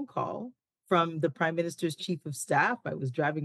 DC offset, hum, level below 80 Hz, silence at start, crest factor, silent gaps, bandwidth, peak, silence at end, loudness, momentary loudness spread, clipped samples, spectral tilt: under 0.1%; none; -80 dBFS; 0 s; 18 dB; none; 12.5 kHz; -12 dBFS; 0 s; -30 LUFS; 9 LU; under 0.1%; -5 dB/octave